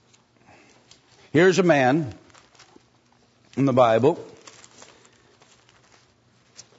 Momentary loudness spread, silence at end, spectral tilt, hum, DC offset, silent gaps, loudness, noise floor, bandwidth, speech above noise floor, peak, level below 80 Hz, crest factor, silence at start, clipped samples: 17 LU; 2.55 s; -6 dB/octave; none; under 0.1%; none; -20 LUFS; -60 dBFS; 8 kHz; 42 dB; -6 dBFS; -68 dBFS; 20 dB; 1.35 s; under 0.1%